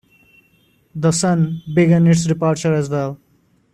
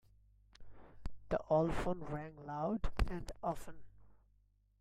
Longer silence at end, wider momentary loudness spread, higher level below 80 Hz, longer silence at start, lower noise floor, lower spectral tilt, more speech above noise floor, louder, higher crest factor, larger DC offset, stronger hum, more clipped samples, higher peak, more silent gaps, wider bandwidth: about the same, 0.6 s vs 0.7 s; second, 12 LU vs 20 LU; second, -52 dBFS vs -46 dBFS; first, 0.95 s vs 0.6 s; second, -57 dBFS vs -72 dBFS; about the same, -6.5 dB/octave vs -7 dB/octave; first, 42 dB vs 35 dB; first, -17 LUFS vs -39 LUFS; second, 14 dB vs 22 dB; neither; second, none vs 50 Hz at -60 dBFS; neither; first, -4 dBFS vs -18 dBFS; neither; second, 11 kHz vs 14 kHz